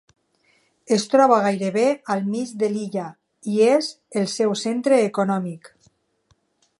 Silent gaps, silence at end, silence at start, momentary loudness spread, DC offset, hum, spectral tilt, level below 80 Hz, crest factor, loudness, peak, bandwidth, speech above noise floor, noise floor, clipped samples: none; 1.1 s; 0.9 s; 13 LU; under 0.1%; none; -5 dB/octave; -74 dBFS; 18 dB; -21 LUFS; -4 dBFS; 11.5 kHz; 45 dB; -65 dBFS; under 0.1%